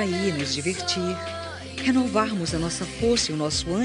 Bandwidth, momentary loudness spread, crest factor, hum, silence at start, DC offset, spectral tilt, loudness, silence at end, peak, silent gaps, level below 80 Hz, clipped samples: 11 kHz; 8 LU; 18 dB; none; 0 s; under 0.1%; -4 dB/octave; -25 LUFS; 0 s; -8 dBFS; none; -46 dBFS; under 0.1%